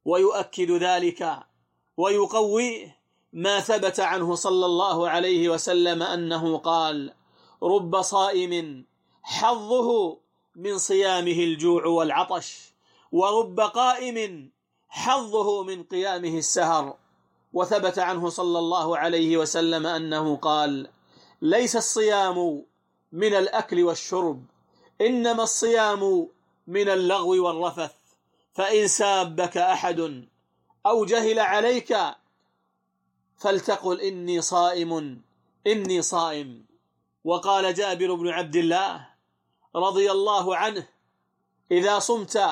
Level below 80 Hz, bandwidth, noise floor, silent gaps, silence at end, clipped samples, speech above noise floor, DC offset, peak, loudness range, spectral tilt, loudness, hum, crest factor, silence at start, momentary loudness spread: -76 dBFS; 12.5 kHz; -74 dBFS; none; 0 s; under 0.1%; 51 dB; under 0.1%; -10 dBFS; 3 LU; -3 dB/octave; -24 LUFS; none; 14 dB; 0.05 s; 10 LU